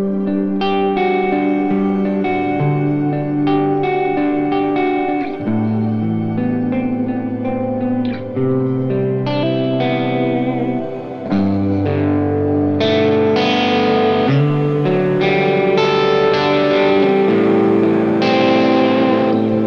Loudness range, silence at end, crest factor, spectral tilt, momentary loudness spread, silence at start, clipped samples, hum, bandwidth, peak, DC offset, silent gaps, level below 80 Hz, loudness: 5 LU; 0 s; 14 dB; -8 dB/octave; 6 LU; 0 s; under 0.1%; none; 6.8 kHz; -2 dBFS; under 0.1%; none; -48 dBFS; -16 LUFS